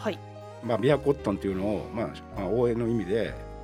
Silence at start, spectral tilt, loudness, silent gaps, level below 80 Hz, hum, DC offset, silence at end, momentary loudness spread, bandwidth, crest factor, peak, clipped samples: 0 s; -7.5 dB/octave; -28 LUFS; none; -46 dBFS; none; under 0.1%; 0 s; 10 LU; 14.5 kHz; 20 dB; -8 dBFS; under 0.1%